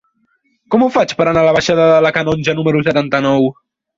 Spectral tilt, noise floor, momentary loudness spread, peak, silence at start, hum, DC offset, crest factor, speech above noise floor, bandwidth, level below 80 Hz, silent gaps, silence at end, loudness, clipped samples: -6 dB/octave; -61 dBFS; 5 LU; 0 dBFS; 0.7 s; none; under 0.1%; 12 dB; 49 dB; 7.8 kHz; -48 dBFS; none; 0.45 s; -13 LUFS; under 0.1%